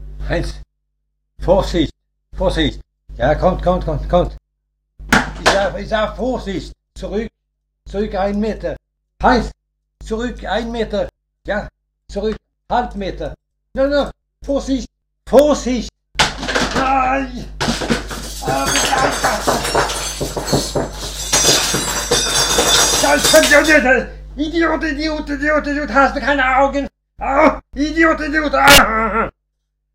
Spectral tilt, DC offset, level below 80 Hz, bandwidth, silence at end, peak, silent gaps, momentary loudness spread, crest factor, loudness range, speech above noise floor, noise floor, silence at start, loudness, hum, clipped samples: -3 dB/octave; under 0.1%; -30 dBFS; 16.5 kHz; 0.65 s; 0 dBFS; none; 15 LU; 18 dB; 10 LU; 56 dB; -72 dBFS; 0 s; -16 LUFS; none; under 0.1%